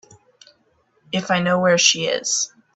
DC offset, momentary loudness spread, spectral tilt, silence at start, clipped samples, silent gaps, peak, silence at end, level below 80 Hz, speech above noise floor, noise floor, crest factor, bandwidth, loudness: under 0.1%; 10 LU; -2.5 dB/octave; 1.1 s; under 0.1%; none; 0 dBFS; 0.3 s; -64 dBFS; 44 dB; -63 dBFS; 22 dB; 8.4 kHz; -18 LUFS